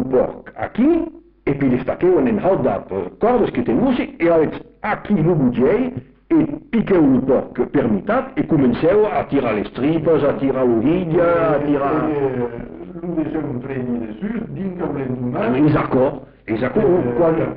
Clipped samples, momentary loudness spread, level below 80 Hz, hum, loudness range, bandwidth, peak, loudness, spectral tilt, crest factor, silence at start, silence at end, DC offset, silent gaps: under 0.1%; 10 LU; -44 dBFS; none; 4 LU; 4.9 kHz; -6 dBFS; -18 LUFS; -7.5 dB/octave; 10 dB; 0 s; 0 s; under 0.1%; none